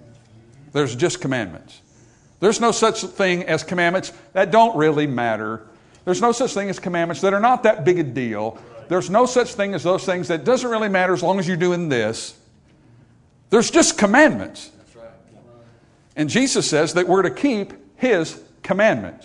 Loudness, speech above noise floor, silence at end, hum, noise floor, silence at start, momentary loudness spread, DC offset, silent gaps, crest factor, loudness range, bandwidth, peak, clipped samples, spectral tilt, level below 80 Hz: -19 LUFS; 34 dB; 0.15 s; none; -53 dBFS; 0.75 s; 11 LU; under 0.1%; none; 18 dB; 3 LU; 11 kHz; -2 dBFS; under 0.1%; -4.5 dB/octave; -58 dBFS